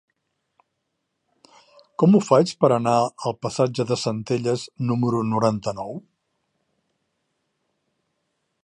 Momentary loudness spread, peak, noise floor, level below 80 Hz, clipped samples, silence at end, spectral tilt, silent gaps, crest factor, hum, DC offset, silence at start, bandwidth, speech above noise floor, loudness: 12 LU; -2 dBFS; -77 dBFS; -64 dBFS; under 0.1%; 2.65 s; -6.5 dB/octave; none; 22 dB; none; under 0.1%; 2 s; 11 kHz; 56 dB; -21 LUFS